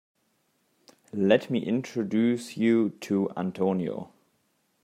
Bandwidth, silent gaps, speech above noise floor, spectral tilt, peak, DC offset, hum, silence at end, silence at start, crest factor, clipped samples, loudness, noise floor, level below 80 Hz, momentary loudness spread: 13.5 kHz; none; 46 dB; -7 dB/octave; -6 dBFS; under 0.1%; none; 0.8 s; 1.15 s; 20 dB; under 0.1%; -27 LUFS; -72 dBFS; -74 dBFS; 10 LU